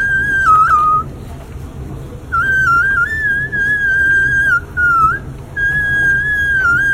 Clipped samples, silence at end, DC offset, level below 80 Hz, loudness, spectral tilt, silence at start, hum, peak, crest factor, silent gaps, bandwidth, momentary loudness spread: under 0.1%; 0 s; under 0.1%; -32 dBFS; -12 LUFS; -4.5 dB/octave; 0 s; none; -2 dBFS; 12 dB; none; 16 kHz; 18 LU